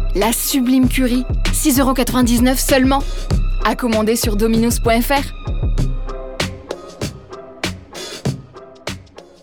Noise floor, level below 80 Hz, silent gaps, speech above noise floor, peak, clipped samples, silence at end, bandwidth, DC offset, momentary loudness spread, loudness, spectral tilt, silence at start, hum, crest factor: -38 dBFS; -24 dBFS; none; 23 dB; -2 dBFS; under 0.1%; 0.2 s; over 20 kHz; under 0.1%; 16 LU; -17 LUFS; -4.5 dB/octave; 0 s; none; 16 dB